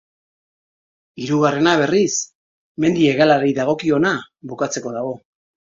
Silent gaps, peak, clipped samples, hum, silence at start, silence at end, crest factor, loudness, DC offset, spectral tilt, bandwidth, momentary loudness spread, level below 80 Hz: 2.35-2.75 s; 0 dBFS; under 0.1%; none; 1.15 s; 0.6 s; 20 dB; -18 LUFS; under 0.1%; -4.5 dB/octave; 7.8 kHz; 16 LU; -60 dBFS